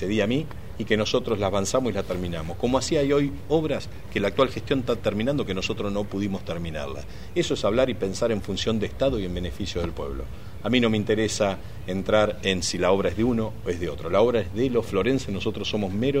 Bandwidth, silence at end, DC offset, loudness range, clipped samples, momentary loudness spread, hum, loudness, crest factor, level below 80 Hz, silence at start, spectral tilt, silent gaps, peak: 16 kHz; 0 s; 1%; 3 LU; under 0.1%; 9 LU; none; -25 LUFS; 20 dB; -42 dBFS; 0 s; -5.5 dB/octave; none; -6 dBFS